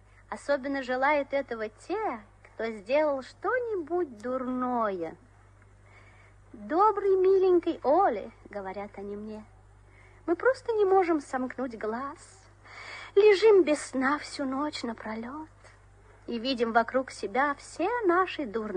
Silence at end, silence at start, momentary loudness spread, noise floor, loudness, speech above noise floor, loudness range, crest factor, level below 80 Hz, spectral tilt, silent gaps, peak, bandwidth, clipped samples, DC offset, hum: 0 s; 0.3 s; 17 LU; -56 dBFS; -28 LUFS; 29 dB; 5 LU; 18 dB; -60 dBFS; -4.5 dB/octave; none; -10 dBFS; 10 kHz; under 0.1%; under 0.1%; none